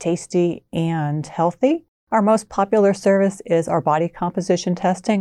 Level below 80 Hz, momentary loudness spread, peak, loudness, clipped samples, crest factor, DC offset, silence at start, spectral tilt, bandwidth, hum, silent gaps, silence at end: -56 dBFS; 6 LU; -6 dBFS; -20 LUFS; under 0.1%; 12 dB; under 0.1%; 0 s; -6.5 dB/octave; 12 kHz; none; 1.88-2.07 s; 0 s